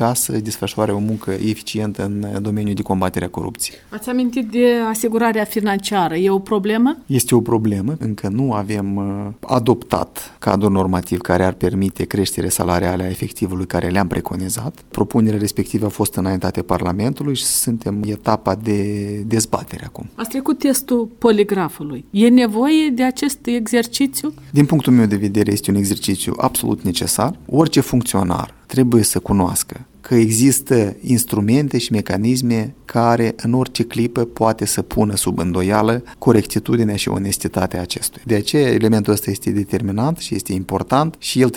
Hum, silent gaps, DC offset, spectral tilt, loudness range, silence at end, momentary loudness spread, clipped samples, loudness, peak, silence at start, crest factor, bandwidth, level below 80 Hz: none; none; under 0.1%; -5 dB/octave; 4 LU; 0 s; 8 LU; under 0.1%; -18 LUFS; 0 dBFS; 0 s; 18 dB; 19.5 kHz; -44 dBFS